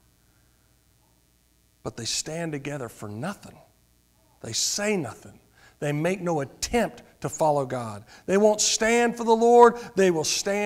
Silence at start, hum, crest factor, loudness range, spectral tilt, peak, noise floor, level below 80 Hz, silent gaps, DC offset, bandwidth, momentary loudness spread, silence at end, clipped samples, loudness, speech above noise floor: 1.85 s; none; 22 dB; 13 LU; -3.5 dB/octave; -4 dBFS; -63 dBFS; -56 dBFS; none; under 0.1%; 16 kHz; 18 LU; 0 s; under 0.1%; -24 LUFS; 40 dB